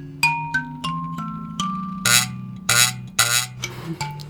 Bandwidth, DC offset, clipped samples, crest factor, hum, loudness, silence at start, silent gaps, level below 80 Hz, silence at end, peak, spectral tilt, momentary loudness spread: over 20 kHz; under 0.1%; under 0.1%; 22 dB; none; -20 LUFS; 0 s; none; -52 dBFS; 0 s; 0 dBFS; -1.5 dB/octave; 13 LU